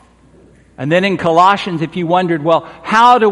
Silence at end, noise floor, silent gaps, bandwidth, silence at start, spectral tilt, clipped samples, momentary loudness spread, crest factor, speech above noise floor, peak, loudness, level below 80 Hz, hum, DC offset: 0 s; -46 dBFS; none; 11.5 kHz; 0.8 s; -6 dB/octave; under 0.1%; 9 LU; 14 dB; 33 dB; 0 dBFS; -13 LUFS; -52 dBFS; none; under 0.1%